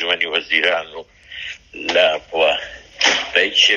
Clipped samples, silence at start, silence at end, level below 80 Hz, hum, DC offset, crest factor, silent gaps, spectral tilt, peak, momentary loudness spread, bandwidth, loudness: under 0.1%; 0 s; 0 s; -54 dBFS; none; under 0.1%; 18 dB; none; 0 dB/octave; 0 dBFS; 18 LU; 11 kHz; -17 LUFS